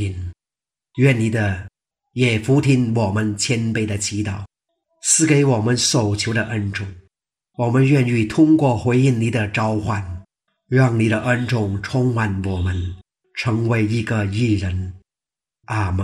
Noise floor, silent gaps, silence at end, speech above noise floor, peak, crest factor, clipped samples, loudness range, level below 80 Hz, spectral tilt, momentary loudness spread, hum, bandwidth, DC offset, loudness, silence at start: -90 dBFS; none; 0 s; 72 dB; -2 dBFS; 16 dB; under 0.1%; 3 LU; -46 dBFS; -5.5 dB/octave; 13 LU; none; 13.5 kHz; under 0.1%; -19 LUFS; 0 s